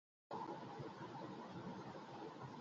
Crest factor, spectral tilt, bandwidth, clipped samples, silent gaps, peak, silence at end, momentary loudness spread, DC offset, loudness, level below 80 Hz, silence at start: 16 dB; -5.5 dB/octave; 7.6 kHz; under 0.1%; none; -36 dBFS; 0 s; 3 LU; under 0.1%; -52 LUFS; -82 dBFS; 0.3 s